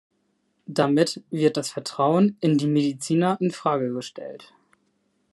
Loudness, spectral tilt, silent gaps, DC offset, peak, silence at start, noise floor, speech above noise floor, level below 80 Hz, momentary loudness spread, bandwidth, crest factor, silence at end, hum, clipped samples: -23 LUFS; -6 dB/octave; none; under 0.1%; -6 dBFS; 0.7 s; -70 dBFS; 48 dB; -72 dBFS; 10 LU; 12 kHz; 18 dB; 0.9 s; none; under 0.1%